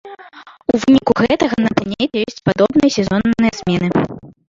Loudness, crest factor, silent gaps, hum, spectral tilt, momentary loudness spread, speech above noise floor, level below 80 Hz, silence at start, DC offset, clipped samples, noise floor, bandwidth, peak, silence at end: -16 LUFS; 14 dB; none; none; -6 dB/octave; 7 LU; 25 dB; -44 dBFS; 0.05 s; under 0.1%; under 0.1%; -40 dBFS; 7.6 kHz; -2 dBFS; 0.2 s